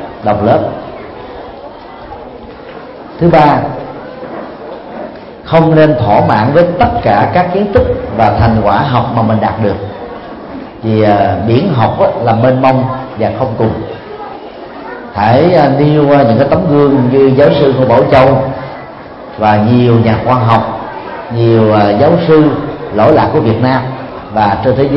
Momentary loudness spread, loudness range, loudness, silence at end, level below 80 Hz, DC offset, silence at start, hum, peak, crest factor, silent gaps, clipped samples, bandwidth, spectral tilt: 20 LU; 6 LU; -9 LUFS; 0 s; -34 dBFS; under 0.1%; 0 s; none; 0 dBFS; 10 dB; none; 0.2%; 5.8 kHz; -10 dB/octave